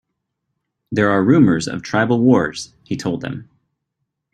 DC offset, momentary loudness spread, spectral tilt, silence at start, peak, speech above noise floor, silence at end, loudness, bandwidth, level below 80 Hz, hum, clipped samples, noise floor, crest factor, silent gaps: under 0.1%; 15 LU; -6.5 dB/octave; 0.9 s; -2 dBFS; 60 dB; 0.9 s; -17 LUFS; 10 kHz; -54 dBFS; none; under 0.1%; -76 dBFS; 16 dB; none